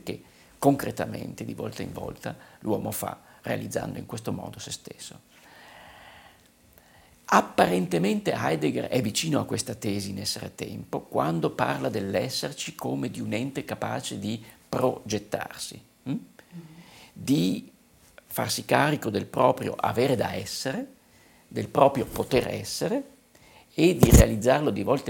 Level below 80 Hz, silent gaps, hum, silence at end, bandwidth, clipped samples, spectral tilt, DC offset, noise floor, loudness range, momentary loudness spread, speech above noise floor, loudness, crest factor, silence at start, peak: -40 dBFS; none; none; 0 s; 17 kHz; under 0.1%; -5 dB/octave; under 0.1%; -57 dBFS; 8 LU; 15 LU; 31 dB; -27 LUFS; 26 dB; 0.05 s; -2 dBFS